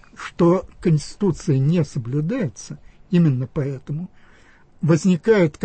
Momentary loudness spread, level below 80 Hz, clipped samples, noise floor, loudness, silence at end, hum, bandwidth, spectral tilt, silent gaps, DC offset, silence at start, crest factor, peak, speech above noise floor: 14 LU; -48 dBFS; under 0.1%; -50 dBFS; -21 LUFS; 0 s; none; 8.8 kHz; -7.5 dB/octave; none; under 0.1%; 0.2 s; 16 dB; -4 dBFS; 30 dB